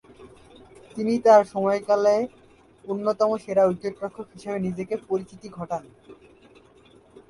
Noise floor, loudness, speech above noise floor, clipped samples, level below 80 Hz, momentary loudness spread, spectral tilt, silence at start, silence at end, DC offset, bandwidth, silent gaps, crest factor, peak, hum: -54 dBFS; -24 LUFS; 31 dB; under 0.1%; -62 dBFS; 18 LU; -6.5 dB/octave; 0.2 s; 1.15 s; under 0.1%; 11.5 kHz; none; 20 dB; -4 dBFS; none